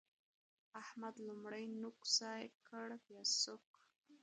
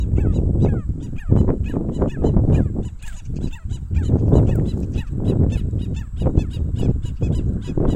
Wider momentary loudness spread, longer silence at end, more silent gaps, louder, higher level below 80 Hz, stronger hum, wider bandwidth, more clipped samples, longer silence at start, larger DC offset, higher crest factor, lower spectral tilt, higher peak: first, 16 LU vs 11 LU; about the same, 0.05 s vs 0 s; first, 2.55-2.60 s, 3.67-3.74 s vs none; second, -43 LUFS vs -21 LUFS; second, under -90 dBFS vs -24 dBFS; neither; first, 10.5 kHz vs 8.8 kHz; neither; first, 0.75 s vs 0 s; neither; first, 24 dB vs 18 dB; second, -1 dB/octave vs -9.5 dB/octave; second, -24 dBFS vs 0 dBFS